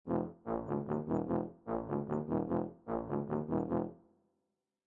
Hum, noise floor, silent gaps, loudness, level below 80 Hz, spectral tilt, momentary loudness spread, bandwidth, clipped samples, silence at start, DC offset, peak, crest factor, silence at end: none; -86 dBFS; none; -37 LUFS; -64 dBFS; -11.5 dB/octave; 5 LU; 7.2 kHz; under 0.1%; 0.05 s; under 0.1%; -22 dBFS; 16 dB; 0.9 s